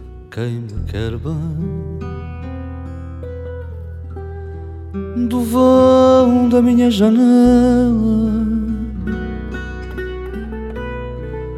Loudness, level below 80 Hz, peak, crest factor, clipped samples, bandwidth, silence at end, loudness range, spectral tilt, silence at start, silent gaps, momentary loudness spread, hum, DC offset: -15 LUFS; -30 dBFS; -2 dBFS; 14 dB; under 0.1%; 13.5 kHz; 0 s; 15 LU; -7.5 dB/octave; 0 s; none; 19 LU; none; under 0.1%